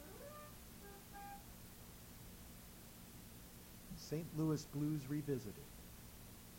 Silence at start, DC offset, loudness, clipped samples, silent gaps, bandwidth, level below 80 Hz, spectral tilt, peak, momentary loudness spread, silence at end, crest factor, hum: 0 s; under 0.1%; -48 LUFS; under 0.1%; none; over 20 kHz; -64 dBFS; -6 dB/octave; -28 dBFS; 15 LU; 0 s; 18 dB; 60 Hz at -65 dBFS